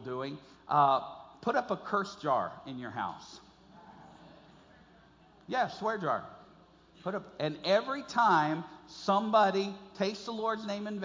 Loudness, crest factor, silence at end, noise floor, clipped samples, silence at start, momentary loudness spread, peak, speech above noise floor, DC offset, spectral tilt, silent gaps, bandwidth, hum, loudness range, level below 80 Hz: -32 LUFS; 20 dB; 0 s; -60 dBFS; under 0.1%; 0 s; 15 LU; -14 dBFS; 29 dB; under 0.1%; -5.5 dB/octave; none; 7.6 kHz; none; 9 LU; -70 dBFS